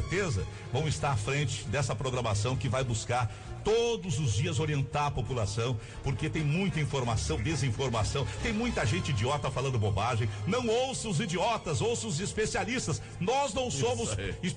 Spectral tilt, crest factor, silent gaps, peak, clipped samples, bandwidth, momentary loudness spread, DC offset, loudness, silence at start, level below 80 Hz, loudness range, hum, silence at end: -5 dB/octave; 10 dB; none; -20 dBFS; under 0.1%; 10.5 kHz; 3 LU; under 0.1%; -31 LUFS; 0 s; -46 dBFS; 1 LU; none; 0 s